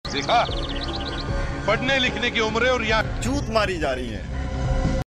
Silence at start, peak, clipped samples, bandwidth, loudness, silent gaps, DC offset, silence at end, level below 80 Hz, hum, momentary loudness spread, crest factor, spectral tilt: 0.05 s; -6 dBFS; under 0.1%; 13 kHz; -23 LUFS; none; 0.1%; 0.05 s; -30 dBFS; none; 8 LU; 18 dB; -4.5 dB/octave